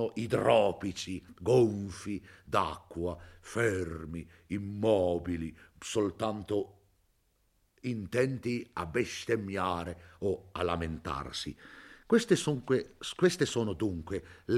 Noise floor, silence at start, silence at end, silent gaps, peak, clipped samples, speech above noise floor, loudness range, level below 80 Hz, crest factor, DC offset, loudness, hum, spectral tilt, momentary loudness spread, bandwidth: -72 dBFS; 0 s; 0 s; none; -10 dBFS; under 0.1%; 41 dB; 4 LU; -58 dBFS; 22 dB; under 0.1%; -32 LUFS; none; -5.5 dB/octave; 14 LU; 14.5 kHz